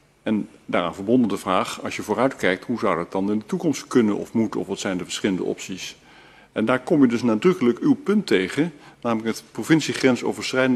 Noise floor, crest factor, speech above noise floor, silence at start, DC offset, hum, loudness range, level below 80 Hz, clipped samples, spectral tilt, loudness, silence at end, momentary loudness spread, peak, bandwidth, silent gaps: -49 dBFS; 20 dB; 28 dB; 0.25 s; under 0.1%; none; 3 LU; -62 dBFS; under 0.1%; -5.5 dB/octave; -22 LUFS; 0 s; 9 LU; -4 dBFS; 13 kHz; none